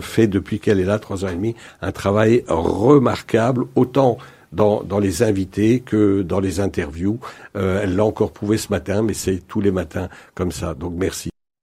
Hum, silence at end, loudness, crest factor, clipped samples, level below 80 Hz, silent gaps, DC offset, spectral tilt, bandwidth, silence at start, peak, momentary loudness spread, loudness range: none; 0.35 s; -19 LUFS; 18 dB; under 0.1%; -44 dBFS; none; under 0.1%; -6.5 dB/octave; 15.5 kHz; 0 s; 0 dBFS; 10 LU; 4 LU